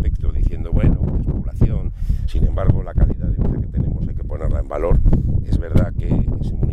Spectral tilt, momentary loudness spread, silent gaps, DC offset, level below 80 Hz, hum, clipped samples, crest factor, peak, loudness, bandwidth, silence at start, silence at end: -10 dB/octave; 6 LU; none; under 0.1%; -20 dBFS; none; under 0.1%; 16 dB; 0 dBFS; -21 LUFS; 4.4 kHz; 0 s; 0 s